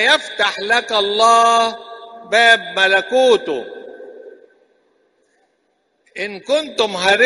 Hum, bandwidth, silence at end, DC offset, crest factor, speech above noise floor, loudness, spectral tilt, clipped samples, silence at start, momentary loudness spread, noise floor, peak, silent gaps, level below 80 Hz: none; 11.5 kHz; 0 s; under 0.1%; 18 dB; 50 dB; -15 LUFS; -1.5 dB/octave; under 0.1%; 0 s; 23 LU; -65 dBFS; 0 dBFS; none; -62 dBFS